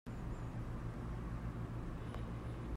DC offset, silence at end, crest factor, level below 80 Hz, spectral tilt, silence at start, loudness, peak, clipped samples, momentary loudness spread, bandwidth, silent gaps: under 0.1%; 0 s; 12 dB; -48 dBFS; -8 dB/octave; 0.05 s; -46 LUFS; -32 dBFS; under 0.1%; 1 LU; 12.5 kHz; none